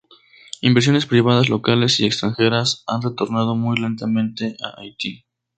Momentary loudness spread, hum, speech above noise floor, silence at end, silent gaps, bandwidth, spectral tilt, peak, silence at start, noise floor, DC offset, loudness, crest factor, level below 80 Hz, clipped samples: 12 LU; none; 31 dB; 0.4 s; none; 9.2 kHz; -5.5 dB/octave; 0 dBFS; 0.65 s; -49 dBFS; under 0.1%; -19 LUFS; 18 dB; -56 dBFS; under 0.1%